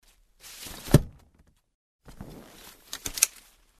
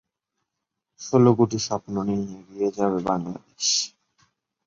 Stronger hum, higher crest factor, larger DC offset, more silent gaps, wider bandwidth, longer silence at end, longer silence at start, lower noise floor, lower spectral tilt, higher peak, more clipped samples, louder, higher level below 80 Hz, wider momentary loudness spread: neither; first, 30 dB vs 20 dB; neither; first, 1.74-1.99 s vs none; first, 14 kHz vs 7.6 kHz; second, 0.55 s vs 0.8 s; second, 0.45 s vs 1 s; second, -63 dBFS vs -83 dBFS; about the same, -4 dB/octave vs -5 dB/octave; first, 0 dBFS vs -4 dBFS; neither; second, -26 LUFS vs -23 LUFS; first, -44 dBFS vs -58 dBFS; first, 24 LU vs 14 LU